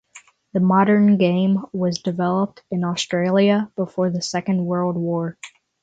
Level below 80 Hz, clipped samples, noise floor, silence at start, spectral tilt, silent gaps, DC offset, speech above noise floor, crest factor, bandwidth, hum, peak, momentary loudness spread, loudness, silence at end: -62 dBFS; under 0.1%; -49 dBFS; 0.15 s; -6.5 dB/octave; none; under 0.1%; 30 dB; 16 dB; 8 kHz; none; -4 dBFS; 10 LU; -20 LUFS; 0.35 s